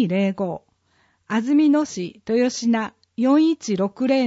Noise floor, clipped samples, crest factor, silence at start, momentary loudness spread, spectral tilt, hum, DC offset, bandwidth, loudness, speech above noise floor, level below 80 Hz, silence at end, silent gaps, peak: -63 dBFS; under 0.1%; 14 dB; 0 s; 11 LU; -5.5 dB/octave; none; under 0.1%; 8 kHz; -21 LUFS; 44 dB; -66 dBFS; 0 s; none; -8 dBFS